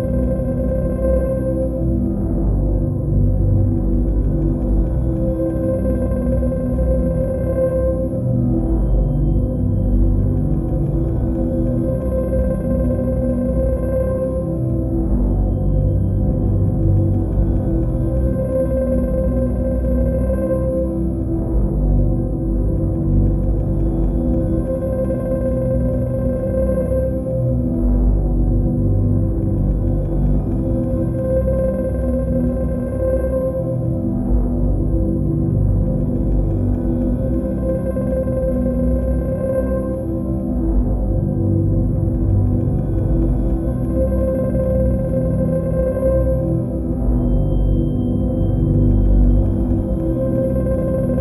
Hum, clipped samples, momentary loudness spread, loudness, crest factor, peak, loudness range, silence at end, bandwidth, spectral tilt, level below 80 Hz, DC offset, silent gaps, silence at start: none; under 0.1%; 3 LU; -19 LUFS; 12 dB; -4 dBFS; 1 LU; 0 s; 11 kHz; -11.5 dB/octave; -20 dBFS; under 0.1%; none; 0 s